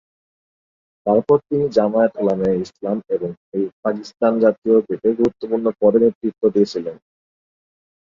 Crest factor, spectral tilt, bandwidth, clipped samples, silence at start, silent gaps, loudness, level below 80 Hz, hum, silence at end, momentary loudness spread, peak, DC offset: 16 dB; -8 dB/octave; 7.4 kHz; under 0.1%; 1.05 s; 3.37-3.52 s, 3.73-3.83 s, 4.58-4.62 s, 6.15-6.21 s; -19 LUFS; -58 dBFS; none; 1.05 s; 9 LU; -2 dBFS; under 0.1%